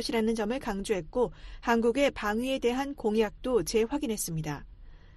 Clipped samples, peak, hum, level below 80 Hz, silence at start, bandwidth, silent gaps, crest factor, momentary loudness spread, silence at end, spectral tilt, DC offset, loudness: under 0.1%; -12 dBFS; none; -48 dBFS; 0 s; 12.5 kHz; none; 16 dB; 6 LU; 0 s; -4.5 dB/octave; under 0.1%; -29 LUFS